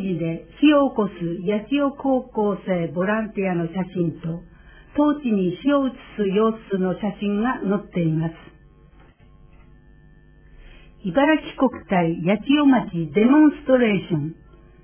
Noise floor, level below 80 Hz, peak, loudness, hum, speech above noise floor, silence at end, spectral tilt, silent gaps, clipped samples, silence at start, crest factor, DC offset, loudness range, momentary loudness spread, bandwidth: -50 dBFS; -50 dBFS; -4 dBFS; -21 LUFS; none; 30 dB; 0.5 s; -11 dB/octave; none; under 0.1%; 0 s; 16 dB; under 0.1%; 8 LU; 10 LU; 3.5 kHz